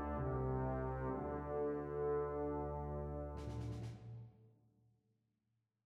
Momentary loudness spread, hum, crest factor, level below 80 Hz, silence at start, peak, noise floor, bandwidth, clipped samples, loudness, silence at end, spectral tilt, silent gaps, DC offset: 10 LU; none; 12 dB; -52 dBFS; 0 s; -30 dBFS; -86 dBFS; 8.4 kHz; under 0.1%; -43 LUFS; 1.35 s; -9.5 dB/octave; none; under 0.1%